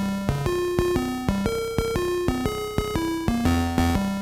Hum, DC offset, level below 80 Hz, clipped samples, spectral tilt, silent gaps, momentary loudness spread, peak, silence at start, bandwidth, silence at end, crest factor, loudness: none; under 0.1%; -34 dBFS; under 0.1%; -6 dB/octave; none; 4 LU; -4 dBFS; 0 s; 17 kHz; 0 s; 18 dB; -25 LUFS